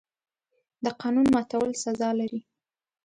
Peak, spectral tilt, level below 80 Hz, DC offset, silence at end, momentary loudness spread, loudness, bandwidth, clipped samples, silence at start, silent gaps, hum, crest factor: -12 dBFS; -5 dB/octave; -62 dBFS; under 0.1%; 0.65 s; 11 LU; -26 LUFS; 11 kHz; under 0.1%; 0.8 s; none; none; 16 dB